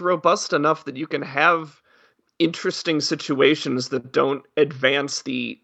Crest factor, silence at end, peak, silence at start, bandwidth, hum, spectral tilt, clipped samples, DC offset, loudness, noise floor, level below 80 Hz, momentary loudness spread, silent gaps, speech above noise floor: 20 dB; 0.1 s; -2 dBFS; 0 s; 9 kHz; none; -4 dB/octave; under 0.1%; under 0.1%; -21 LUFS; -60 dBFS; -76 dBFS; 8 LU; none; 38 dB